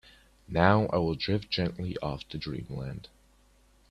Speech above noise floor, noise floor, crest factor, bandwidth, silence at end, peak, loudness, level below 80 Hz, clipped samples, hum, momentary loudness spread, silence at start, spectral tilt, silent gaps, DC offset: 33 dB; -62 dBFS; 24 dB; 11.5 kHz; 0.85 s; -6 dBFS; -30 LUFS; -52 dBFS; under 0.1%; none; 15 LU; 0.5 s; -7.5 dB/octave; none; under 0.1%